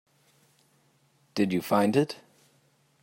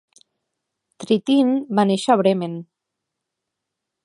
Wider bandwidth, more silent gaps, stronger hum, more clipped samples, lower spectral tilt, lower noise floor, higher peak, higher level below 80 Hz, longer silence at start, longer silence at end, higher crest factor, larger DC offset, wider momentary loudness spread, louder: first, 16 kHz vs 11.5 kHz; neither; neither; neither; about the same, -6 dB/octave vs -6.5 dB/octave; second, -66 dBFS vs -82 dBFS; second, -10 dBFS vs -2 dBFS; about the same, -74 dBFS vs -76 dBFS; first, 1.35 s vs 1 s; second, 0.9 s vs 1.4 s; about the same, 20 dB vs 20 dB; neither; about the same, 13 LU vs 14 LU; second, -27 LUFS vs -19 LUFS